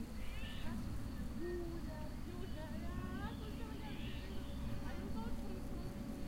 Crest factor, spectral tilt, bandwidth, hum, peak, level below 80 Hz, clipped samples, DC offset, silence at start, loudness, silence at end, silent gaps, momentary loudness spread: 12 dB; -6.5 dB/octave; 16 kHz; none; -30 dBFS; -48 dBFS; under 0.1%; under 0.1%; 0 s; -47 LUFS; 0 s; none; 3 LU